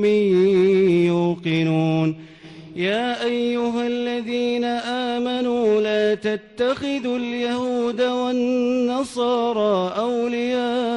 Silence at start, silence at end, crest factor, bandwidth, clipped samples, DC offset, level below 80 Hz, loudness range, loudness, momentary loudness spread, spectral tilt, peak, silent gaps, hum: 0 s; 0 s; 10 dB; 11 kHz; under 0.1%; under 0.1%; -60 dBFS; 3 LU; -21 LUFS; 7 LU; -6.5 dB/octave; -10 dBFS; none; none